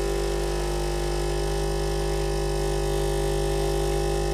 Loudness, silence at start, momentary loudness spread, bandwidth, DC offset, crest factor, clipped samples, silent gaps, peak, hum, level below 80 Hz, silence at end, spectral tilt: -27 LUFS; 0 s; 2 LU; 14.5 kHz; under 0.1%; 12 dB; under 0.1%; none; -14 dBFS; 50 Hz at -30 dBFS; -30 dBFS; 0 s; -5 dB/octave